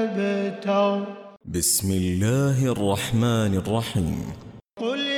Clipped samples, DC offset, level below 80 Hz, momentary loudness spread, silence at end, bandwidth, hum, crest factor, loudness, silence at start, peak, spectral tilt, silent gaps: under 0.1%; under 0.1%; -46 dBFS; 12 LU; 0 s; 19 kHz; none; 14 dB; -23 LUFS; 0 s; -10 dBFS; -5 dB/octave; none